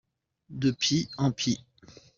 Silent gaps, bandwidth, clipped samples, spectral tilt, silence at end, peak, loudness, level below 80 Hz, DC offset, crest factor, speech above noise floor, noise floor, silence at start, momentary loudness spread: none; 7.6 kHz; under 0.1%; -4.5 dB/octave; 0.25 s; -12 dBFS; -28 LUFS; -60 dBFS; under 0.1%; 18 dB; 29 dB; -56 dBFS; 0.5 s; 8 LU